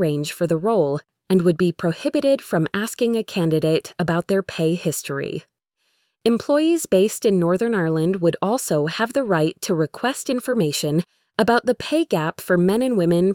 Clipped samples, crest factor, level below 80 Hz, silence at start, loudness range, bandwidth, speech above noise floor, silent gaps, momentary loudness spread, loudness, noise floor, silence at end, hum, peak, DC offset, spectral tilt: under 0.1%; 16 dB; -58 dBFS; 0 s; 3 LU; 18.5 kHz; 50 dB; none; 6 LU; -21 LUFS; -70 dBFS; 0 s; none; -4 dBFS; under 0.1%; -5.5 dB/octave